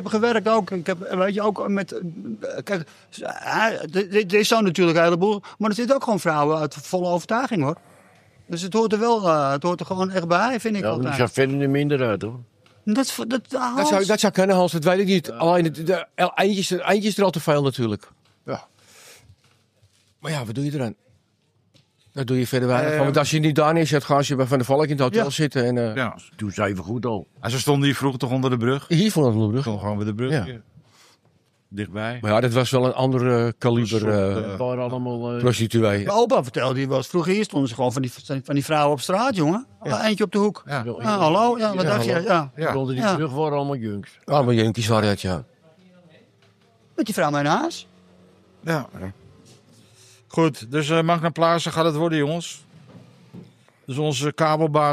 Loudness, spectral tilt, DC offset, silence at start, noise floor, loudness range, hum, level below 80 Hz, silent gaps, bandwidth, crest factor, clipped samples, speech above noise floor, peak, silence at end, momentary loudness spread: -22 LUFS; -5.5 dB/octave; under 0.1%; 0 s; -65 dBFS; 6 LU; none; -60 dBFS; none; 15.5 kHz; 18 dB; under 0.1%; 44 dB; -4 dBFS; 0 s; 11 LU